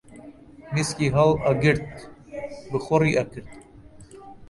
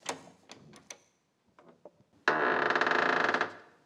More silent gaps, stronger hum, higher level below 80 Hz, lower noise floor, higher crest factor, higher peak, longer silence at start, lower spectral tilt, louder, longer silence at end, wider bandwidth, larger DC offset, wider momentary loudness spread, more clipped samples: neither; neither; first, -48 dBFS vs -82 dBFS; second, -47 dBFS vs -73 dBFS; second, 18 dB vs 24 dB; about the same, -6 dBFS vs -8 dBFS; about the same, 0.1 s vs 0.05 s; first, -6 dB/octave vs -3 dB/octave; first, -23 LUFS vs -29 LUFS; second, 0.05 s vs 0.25 s; second, 11.5 kHz vs 15.5 kHz; neither; second, 19 LU vs 23 LU; neither